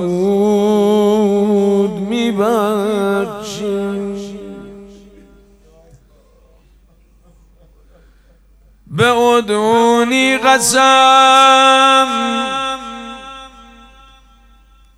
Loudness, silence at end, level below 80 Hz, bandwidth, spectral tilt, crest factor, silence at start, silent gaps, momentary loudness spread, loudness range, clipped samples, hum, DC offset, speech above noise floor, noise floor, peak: -12 LUFS; 1.5 s; -48 dBFS; 15.5 kHz; -3.5 dB/octave; 14 dB; 0 s; none; 21 LU; 14 LU; under 0.1%; none; under 0.1%; 38 dB; -49 dBFS; 0 dBFS